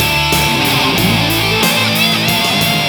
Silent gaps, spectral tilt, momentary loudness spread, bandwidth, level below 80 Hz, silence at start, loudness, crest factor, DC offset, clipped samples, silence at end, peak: none; -3.5 dB/octave; 1 LU; over 20 kHz; -32 dBFS; 0 s; -11 LUFS; 12 dB; under 0.1%; under 0.1%; 0 s; 0 dBFS